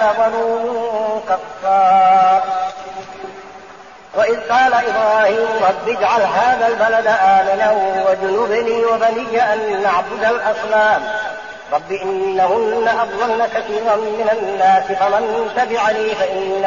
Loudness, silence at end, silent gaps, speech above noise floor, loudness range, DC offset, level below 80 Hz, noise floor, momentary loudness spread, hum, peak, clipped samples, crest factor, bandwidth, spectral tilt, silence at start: -16 LUFS; 0 s; none; 23 dB; 3 LU; 0.3%; -56 dBFS; -38 dBFS; 9 LU; none; -4 dBFS; under 0.1%; 12 dB; 7.2 kHz; -1.5 dB/octave; 0 s